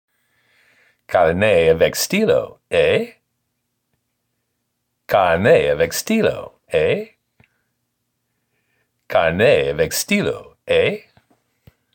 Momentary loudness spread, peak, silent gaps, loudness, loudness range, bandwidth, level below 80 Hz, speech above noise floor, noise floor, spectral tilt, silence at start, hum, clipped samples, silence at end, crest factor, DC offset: 9 LU; -2 dBFS; none; -17 LUFS; 4 LU; 17 kHz; -48 dBFS; 57 dB; -73 dBFS; -4.5 dB/octave; 1.1 s; none; under 0.1%; 0.95 s; 16 dB; under 0.1%